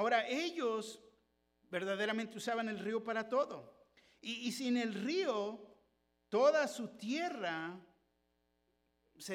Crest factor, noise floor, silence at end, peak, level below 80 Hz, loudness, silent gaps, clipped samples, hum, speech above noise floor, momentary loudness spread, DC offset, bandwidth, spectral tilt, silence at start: 20 dB; -80 dBFS; 0 s; -18 dBFS; -84 dBFS; -37 LUFS; none; under 0.1%; none; 43 dB; 15 LU; under 0.1%; 16.5 kHz; -4 dB/octave; 0 s